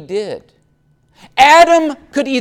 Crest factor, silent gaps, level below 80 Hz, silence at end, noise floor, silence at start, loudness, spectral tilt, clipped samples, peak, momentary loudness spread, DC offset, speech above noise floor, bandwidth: 12 dB; none; -50 dBFS; 0 s; -56 dBFS; 0 s; -11 LUFS; -2.5 dB/octave; under 0.1%; 0 dBFS; 19 LU; under 0.1%; 44 dB; 16 kHz